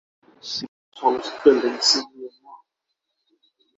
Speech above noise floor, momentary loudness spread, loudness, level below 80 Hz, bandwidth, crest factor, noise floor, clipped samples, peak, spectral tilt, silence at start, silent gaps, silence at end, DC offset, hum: 59 dB; 22 LU; -20 LUFS; -66 dBFS; 8 kHz; 22 dB; -79 dBFS; under 0.1%; -2 dBFS; -1.5 dB/octave; 0.45 s; 0.68-0.92 s; 1.2 s; under 0.1%; none